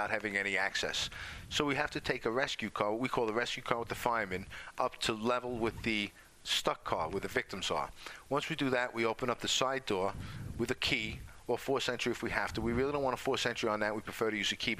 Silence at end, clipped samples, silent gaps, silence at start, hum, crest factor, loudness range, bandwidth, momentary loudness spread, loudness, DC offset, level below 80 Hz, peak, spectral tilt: 0 s; under 0.1%; none; 0 s; none; 26 dB; 1 LU; 15.5 kHz; 7 LU; -34 LUFS; under 0.1%; -56 dBFS; -10 dBFS; -3.5 dB/octave